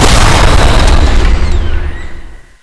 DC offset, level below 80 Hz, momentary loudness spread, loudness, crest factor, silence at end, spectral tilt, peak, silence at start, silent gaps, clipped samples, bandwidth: under 0.1%; -8 dBFS; 15 LU; -10 LUFS; 6 dB; 0.1 s; -4.5 dB/octave; 0 dBFS; 0 s; none; 0.9%; 11 kHz